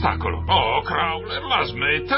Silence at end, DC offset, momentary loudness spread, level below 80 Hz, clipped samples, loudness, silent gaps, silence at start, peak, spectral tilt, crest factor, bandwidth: 0 s; under 0.1%; 6 LU; -34 dBFS; under 0.1%; -21 LUFS; none; 0 s; -6 dBFS; -9.5 dB/octave; 16 dB; 5.8 kHz